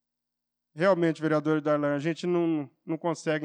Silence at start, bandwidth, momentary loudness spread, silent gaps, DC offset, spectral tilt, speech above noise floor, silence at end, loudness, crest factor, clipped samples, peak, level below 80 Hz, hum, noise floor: 0.75 s; 9.6 kHz; 7 LU; none; under 0.1%; -7 dB/octave; 59 dB; 0 s; -27 LUFS; 16 dB; under 0.1%; -12 dBFS; under -90 dBFS; 60 Hz at -60 dBFS; -86 dBFS